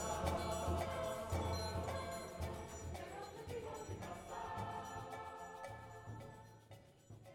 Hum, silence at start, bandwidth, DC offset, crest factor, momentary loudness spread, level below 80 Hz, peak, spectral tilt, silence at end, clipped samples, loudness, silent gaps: none; 0 s; 17.5 kHz; under 0.1%; 22 dB; 16 LU; -56 dBFS; -24 dBFS; -5 dB/octave; 0 s; under 0.1%; -45 LUFS; none